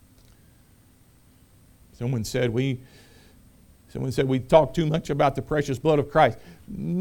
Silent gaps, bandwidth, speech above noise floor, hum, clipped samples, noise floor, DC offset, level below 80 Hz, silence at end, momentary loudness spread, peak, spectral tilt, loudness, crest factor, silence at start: none; 18.5 kHz; 33 dB; none; under 0.1%; -56 dBFS; under 0.1%; -48 dBFS; 0 s; 15 LU; -2 dBFS; -6.5 dB/octave; -24 LUFS; 24 dB; 2 s